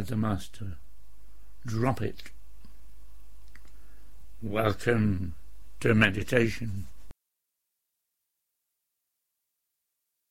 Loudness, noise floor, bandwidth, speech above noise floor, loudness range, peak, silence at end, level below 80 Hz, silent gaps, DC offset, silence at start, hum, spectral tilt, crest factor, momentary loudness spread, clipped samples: -28 LUFS; -83 dBFS; 16 kHz; 55 dB; 9 LU; -6 dBFS; 0 s; -50 dBFS; none; 2%; 0 s; none; -6.5 dB/octave; 24 dB; 20 LU; under 0.1%